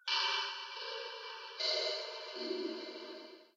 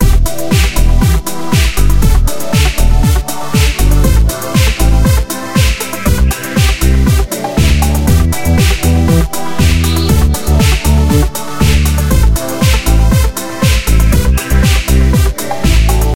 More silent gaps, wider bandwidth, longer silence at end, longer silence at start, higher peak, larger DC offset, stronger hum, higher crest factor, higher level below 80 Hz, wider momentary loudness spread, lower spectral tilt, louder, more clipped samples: neither; second, 7.8 kHz vs 17 kHz; about the same, 0.1 s vs 0 s; about the same, 0.05 s vs 0 s; second, -20 dBFS vs 0 dBFS; neither; neither; first, 20 dB vs 10 dB; second, under -90 dBFS vs -12 dBFS; first, 13 LU vs 4 LU; second, 0.5 dB/octave vs -5 dB/octave; second, -38 LUFS vs -12 LUFS; neither